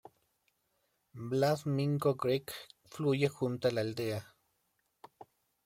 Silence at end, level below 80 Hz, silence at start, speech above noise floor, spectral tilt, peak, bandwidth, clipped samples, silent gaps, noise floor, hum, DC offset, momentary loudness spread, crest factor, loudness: 0.45 s; -74 dBFS; 1.15 s; 46 dB; -6.5 dB/octave; -16 dBFS; 16.5 kHz; under 0.1%; none; -79 dBFS; none; under 0.1%; 14 LU; 18 dB; -33 LUFS